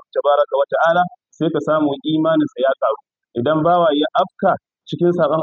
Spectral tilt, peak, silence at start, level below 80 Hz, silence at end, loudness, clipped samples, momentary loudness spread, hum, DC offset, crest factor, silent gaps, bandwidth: -7.5 dB/octave; -4 dBFS; 0.15 s; -64 dBFS; 0 s; -18 LUFS; under 0.1%; 8 LU; none; under 0.1%; 14 dB; none; 7.2 kHz